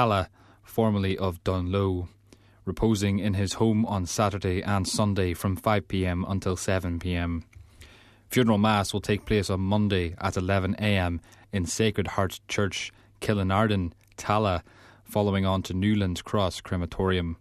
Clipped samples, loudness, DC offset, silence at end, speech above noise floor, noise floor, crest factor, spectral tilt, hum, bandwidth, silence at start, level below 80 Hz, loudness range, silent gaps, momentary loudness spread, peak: under 0.1%; -27 LUFS; under 0.1%; 0.05 s; 26 dB; -52 dBFS; 20 dB; -5.5 dB/octave; none; 14 kHz; 0 s; -46 dBFS; 2 LU; none; 8 LU; -8 dBFS